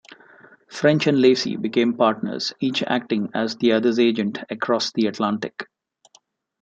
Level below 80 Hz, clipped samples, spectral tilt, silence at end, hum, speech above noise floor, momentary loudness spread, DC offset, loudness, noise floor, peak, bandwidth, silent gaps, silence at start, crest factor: -68 dBFS; under 0.1%; -5.5 dB/octave; 1 s; none; 38 dB; 10 LU; under 0.1%; -21 LUFS; -59 dBFS; -4 dBFS; 8.2 kHz; none; 0.7 s; 18 dB